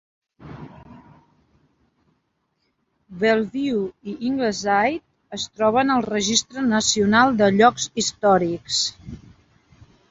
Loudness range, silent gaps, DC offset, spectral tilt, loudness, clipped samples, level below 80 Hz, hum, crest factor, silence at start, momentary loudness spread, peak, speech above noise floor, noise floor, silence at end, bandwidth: 9 LU; none; under 0.1%; -3.5 dB/octave; -20 LUFS; under 0.1%; -54 dBFS; none; 20 dB; 0.4 s; 21 LU; -2 dBFS; 51 dB; -71 dBFS; 0.95 s; 8 kHz